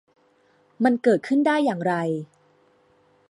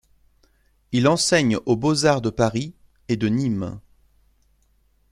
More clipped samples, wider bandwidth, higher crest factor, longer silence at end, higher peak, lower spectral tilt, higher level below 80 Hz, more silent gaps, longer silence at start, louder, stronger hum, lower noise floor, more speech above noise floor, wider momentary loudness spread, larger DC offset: neither; second, 11.5 kHz vs 15.5 kHz; about the same, 18 dB vs 20 dB; second, 1.05 s vs 1.3 s; second, -6 dBFS vs -2 dBFS; first, -7 dB/octave vs -5 dB/octave; second, -76 dBFS vs -52 dBFS; neither; about the same, 0.8 s vs 0.9 s; about the same, -22 LUFS vs -21 LUFS; first, 50 Hz at -60 dBFS vs none; about the same, -61 dBFS vs -62 dBFS; about the same, 40 dB vs 42 dB; about the same, 10 LU vs 12 LU; neither